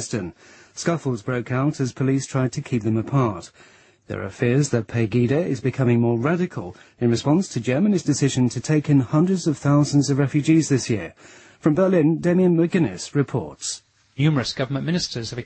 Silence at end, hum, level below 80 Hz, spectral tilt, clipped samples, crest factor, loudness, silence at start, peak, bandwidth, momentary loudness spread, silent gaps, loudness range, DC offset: 0 s; none; -56 dBFS; -6.5 dB/octave; under 0.1%; 16 dB; -21 LUFS; 0 s; -4 dBFS; 8.8 kHz; 11 LU; none; 4 LU; under 0.1%